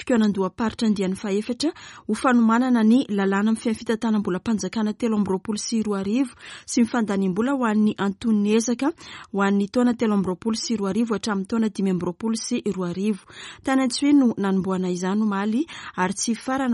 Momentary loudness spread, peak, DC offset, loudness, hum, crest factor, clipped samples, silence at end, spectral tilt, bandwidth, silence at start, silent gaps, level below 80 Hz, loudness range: 8 LU; -6 dBFS; under 0.1%; -23 LUFS; none; 16 dB; under 0.1%; 0 s; -5.5 dB/octave; 11.5 kHz; 0 s; none; -58 dBFS; 3 LU